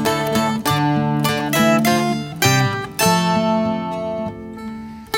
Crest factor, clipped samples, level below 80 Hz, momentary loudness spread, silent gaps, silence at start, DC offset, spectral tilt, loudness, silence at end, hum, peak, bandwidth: 16 dB; under 0.1%; -48 dBFS; 14 LU; none; 0 s; under 0.1%; -4.5 dB/octave; -18 LUFS; 0 s; none; -2 dBFS; 17 kHz